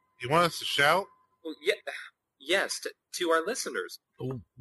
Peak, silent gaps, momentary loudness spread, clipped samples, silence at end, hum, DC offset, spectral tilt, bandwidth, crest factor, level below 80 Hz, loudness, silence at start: -10 dBFS; none; 18 LU; under 0.1%; 0.2 s; none; under 0.1%; -3 dB/octave; 12.5 kHz; 20 dB; -70 dBFS; -29 LUFS; 0.2 s